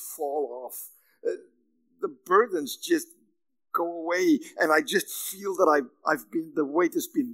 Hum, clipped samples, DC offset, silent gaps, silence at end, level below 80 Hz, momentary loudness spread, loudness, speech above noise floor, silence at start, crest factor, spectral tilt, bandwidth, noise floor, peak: none; under 0.1%; under 0.1%; none; 0 s; under -90 dBFS; 13 LU; -27 LUFS; 43 dB; 0 s; 20 dB; -3 dB/octave; 16 kHz; -69 dBFS; -8 dBFS